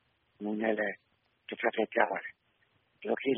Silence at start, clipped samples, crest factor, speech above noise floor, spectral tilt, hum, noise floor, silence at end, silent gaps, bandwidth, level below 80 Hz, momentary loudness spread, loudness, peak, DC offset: 0.4 s; under 0.1%; 26 dB; 41 dB; -3 dB/octave; none; -72 dBFS; 0 s; none; 3.8 kHz; -80 dBFS; 17 LU; -33 LUFS; -8 dBFS; under 0.1%